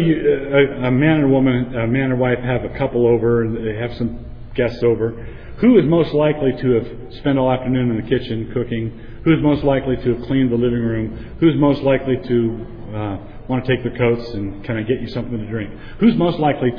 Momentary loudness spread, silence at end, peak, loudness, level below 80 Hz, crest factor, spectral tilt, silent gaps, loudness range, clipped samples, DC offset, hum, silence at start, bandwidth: 11 LU; 0 s; -2 dBFS; -18 LUFS; -36 dBFS; 16 dB; -10 dB/octave; none; 4 LU; under 0.1%; under 0.1%; none; 0 s; 5.4 kHz